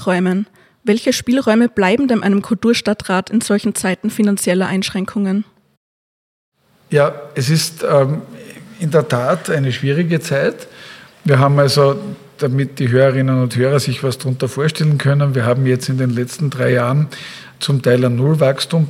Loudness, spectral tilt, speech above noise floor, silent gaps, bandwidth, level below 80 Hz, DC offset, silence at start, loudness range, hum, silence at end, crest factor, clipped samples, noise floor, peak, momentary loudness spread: -16 LUFS; -6 dB/octave; 23 dB; 5.77-6.52 s; 15.5 kHz; -56 dBFS; under 0.1%; 0 s; 4 LU; none; 0 s; 16 dB; under 0.1%; -38 dBFS; 0 dBFS; 10 LU